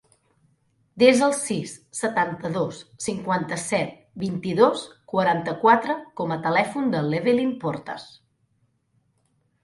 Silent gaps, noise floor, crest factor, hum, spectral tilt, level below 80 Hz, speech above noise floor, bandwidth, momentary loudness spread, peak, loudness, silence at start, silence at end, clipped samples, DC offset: none; -68 dBFS; 22 dB; none; -5 dB/octave; -64 dBFS; 46 dB; 11.5 kHz; 13 LU; -2 dBFS; -23 LUFS; 0.95 s; 1.55 s; under 0.1%; under 0.1%